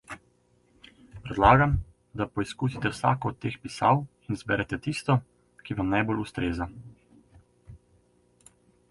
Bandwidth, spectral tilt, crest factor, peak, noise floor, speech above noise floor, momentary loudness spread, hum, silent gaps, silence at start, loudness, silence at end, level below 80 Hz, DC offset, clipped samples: 11.5 kHz; -6.5 dB/octave; 24 dB; -4 dBFS; -65 dBFS; 39 dB; 17 LU; 60 Hz at -55 dBFS; none; 0.1 s; -27 LUFS; 1.15 s; -44 dBFS; under 0.1%; under 0.1%